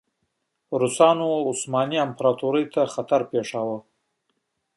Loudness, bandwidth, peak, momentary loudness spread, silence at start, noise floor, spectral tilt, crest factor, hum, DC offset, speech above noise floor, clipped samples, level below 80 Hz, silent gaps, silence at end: -23 LUFS; 11.5 kHz; -4 dBFS; 10 LU; 0.7 s; -75 dBFS; -4.5 dB/octave; 20 dB; none; under 0.1%; 53 dB; under 0.1%; -72 dBFS; none; 0.95 s